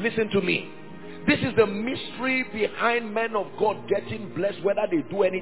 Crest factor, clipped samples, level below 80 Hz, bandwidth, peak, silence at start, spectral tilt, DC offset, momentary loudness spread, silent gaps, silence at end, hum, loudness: 18 dB; under 0.1%; -56 dBFS; 4 kHz; -6 dBFS; 0 s; -9.5 dB/octave; 0.7%; 7 LU; none; 0 s; none; -25 LUFS